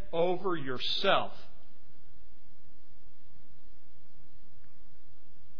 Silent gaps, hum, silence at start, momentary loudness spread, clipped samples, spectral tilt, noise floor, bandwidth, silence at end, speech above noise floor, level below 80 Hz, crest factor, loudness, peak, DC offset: none; none; 0 s; 13 LU; under 0.1%; -5.5 dB/octave; -62 dBFS; 5.4 kHz; 0.15 s; 31 dB; -62 dBFS; 24 dB; -31 LUFS; -12 dBFS; 4%